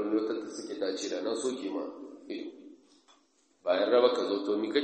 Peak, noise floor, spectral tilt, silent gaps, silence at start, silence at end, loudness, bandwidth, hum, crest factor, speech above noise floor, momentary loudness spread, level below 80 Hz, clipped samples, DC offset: -10 dBFS; -68 dBFS; -3.5 dB/octave; none; 0 s; 0 s; -31 LUFS; 8.4 kHz; none; 22 dB; 39 dB; 16 LU; -80 dBFS; under 0.1%; under 0.1%